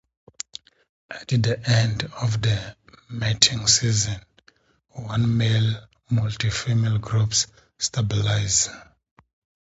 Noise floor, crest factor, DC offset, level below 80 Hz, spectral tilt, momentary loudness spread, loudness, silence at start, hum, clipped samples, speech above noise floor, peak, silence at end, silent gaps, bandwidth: -60 dBFS; 24 dB; under 0.1%; -46 dBFS; -3.5 dB/octave; 18 LU; -22 LUFS; 1.1 s; none; under 0.1%; 38 dB; 0 dBFS; 0.9 s; none; 8.2 kHz